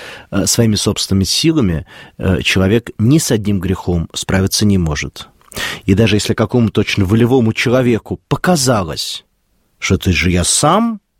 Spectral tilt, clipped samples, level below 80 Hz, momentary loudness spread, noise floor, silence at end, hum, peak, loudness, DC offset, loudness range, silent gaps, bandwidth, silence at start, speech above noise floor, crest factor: -4.5 dB/octave; under 0.1%; -34 dBFS; 10 LU; -60 dBFS; 0.2 s; none; 0 dBFS; -14 LUFS; under 0.1%; 2 LU; none; 16.5 kHz; 0 s; 46 dB; 14 dB